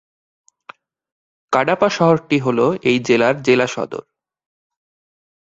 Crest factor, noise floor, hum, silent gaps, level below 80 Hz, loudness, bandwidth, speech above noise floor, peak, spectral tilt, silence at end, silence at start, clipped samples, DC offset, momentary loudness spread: 18 dB; -44 dBFS; none; none; -60 dBFS; -17 LUFS; 8 kHz; 28 dB; 0 dBFS; -5.5 dB/octave; 1.5 s; 1.5 s; under 0.1%; under 0.1%; 8 LU